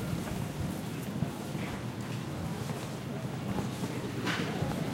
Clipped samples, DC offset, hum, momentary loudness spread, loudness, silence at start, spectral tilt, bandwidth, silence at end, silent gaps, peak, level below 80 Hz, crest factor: under 0.1%; under 0.1%; none; 5 LU; -36 LUFS; 0 s; -5.5 dB/octave; 16 kHz; 0 s; none; -18 dBFS; -54 dBFS; 18 dB